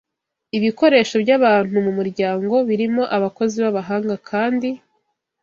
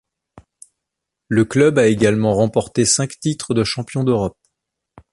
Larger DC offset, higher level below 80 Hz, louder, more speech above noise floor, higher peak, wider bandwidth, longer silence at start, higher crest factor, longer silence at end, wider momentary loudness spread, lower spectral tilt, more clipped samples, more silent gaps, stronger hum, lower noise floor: neither; second, -64 dBFS vs -48 dBFS; about the same, -18 LUFS vs -17 LUFS; second, 52 dB vs 65 dB; about the same, -2 dBFS vs -2 dBFS; second, 7.4 kHz vs 11.5 kHz; second, 0.55 s vs 1.3 s; about the same, 16 dB vs 16 dB; second, 0.65 s vs 0.8 s; about the same, 9 LU vs 7 LU; about the same, -6 dB/octave vs -5 dB/octave; neither; neither; neither; second, -70 dBFS vs -81 dBFS